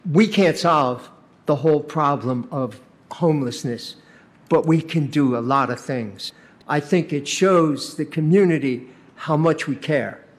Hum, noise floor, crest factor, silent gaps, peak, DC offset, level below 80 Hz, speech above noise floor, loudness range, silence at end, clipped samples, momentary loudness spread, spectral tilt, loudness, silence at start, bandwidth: none; -50 dBFS; 16 dB; none; -4 dBFS; under 0.1%; -66 dBFS; 30 dB; 3 LU; 0.2 s; under 0.1%; 14 LU; -6 dB/octave; -20 LUFS; 0.05 s; 13.5 kHz